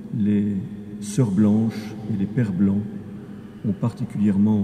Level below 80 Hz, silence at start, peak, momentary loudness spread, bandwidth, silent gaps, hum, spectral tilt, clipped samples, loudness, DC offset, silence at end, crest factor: -56 dBFS; 0 s; -8 dBFS; 15 LU; 10 kHz; none; none; -8 dB/octave; under 0.1%; -23 LUFS; under 0.1%; 0 s; 14 dB